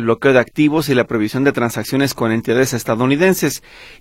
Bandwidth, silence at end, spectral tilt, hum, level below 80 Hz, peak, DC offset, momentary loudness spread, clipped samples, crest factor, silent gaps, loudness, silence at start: 16.5 kHz; 0.05 s; -5.5 dB/octave; none; -48 dBFS; 0 dBFS; under 0.1%; 5 LU; under 0.1%; 16 dB; none; -16 LUFS; 0 s